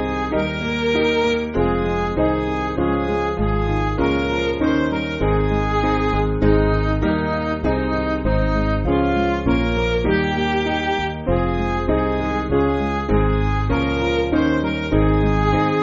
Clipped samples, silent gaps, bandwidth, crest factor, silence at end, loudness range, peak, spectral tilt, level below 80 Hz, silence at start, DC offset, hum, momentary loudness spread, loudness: under 0.1%; none; 7.4 kHz; 16 dB; 0 s; 1 LU; -4 dBFS; -5.5 dB/octave; -26 dBFS; 0 s; under 0.1%; none; 4 LU; -20 LUFS